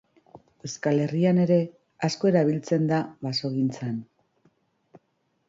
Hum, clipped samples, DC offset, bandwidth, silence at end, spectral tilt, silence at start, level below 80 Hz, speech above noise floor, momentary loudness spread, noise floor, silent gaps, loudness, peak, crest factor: none; under 0.1%; under 0.1%; 7.8 kHz; 1.45 s; -6.5 dB/octave; 0.35 s; -68 dBFS; 49 dB; 12 LU; -72 dBFS; none; -25 LUFS; -8 dBFS; 18 dB